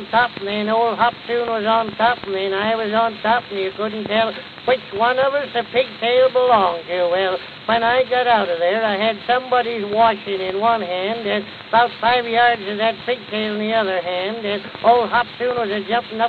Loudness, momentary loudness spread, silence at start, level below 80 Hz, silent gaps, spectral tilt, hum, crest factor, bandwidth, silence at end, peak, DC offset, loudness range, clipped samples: -19 LUFS; 7 LU; 0 s; -58 dBFS; none; -6.5 dB/octave; none; 16 dB; 5 kHz; 0 s; -2 dBFS; under 0.1%; 2 LU; under 0.1%